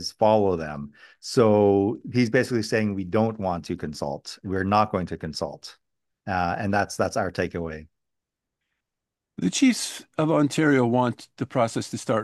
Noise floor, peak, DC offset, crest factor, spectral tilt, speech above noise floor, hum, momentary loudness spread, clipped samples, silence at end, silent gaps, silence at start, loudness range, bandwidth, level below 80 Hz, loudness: -86 dBFS; -6 dBFS; under 0.1%; 18 dB; -5.5 dB/octave; 62 dB; none; 14 LU; under 0.1%; 0 s; none; 0 s; 6 LU; 12.5 kHz; -58 dBFS; -24 LUFS